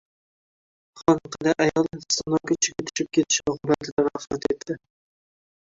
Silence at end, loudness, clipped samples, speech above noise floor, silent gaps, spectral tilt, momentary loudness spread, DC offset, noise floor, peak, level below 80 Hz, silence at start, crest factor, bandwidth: 0.9 s; -24 LUFS; under 0.1%; over 66 dB; 3.92-3.97 s; -3.5 dB/octave; 7 LU; under 0.1%; under -90 dBFS; -4 dBFS; -56 dBFS; 0.95 s; 22 dB; 7.8 kHz